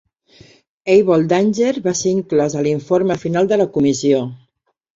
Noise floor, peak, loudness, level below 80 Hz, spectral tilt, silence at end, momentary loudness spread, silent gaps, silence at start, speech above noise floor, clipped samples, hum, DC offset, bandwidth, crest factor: -65 dBFS; -2 dBFS; -16 LUFS; -56 dBFS; -5.5 dB/octave; 0.6 s; 5 LU; none; 0.85 s; 50 dB; under 0.1%; none; under 0.1%; 7.8 kHz; 16 dB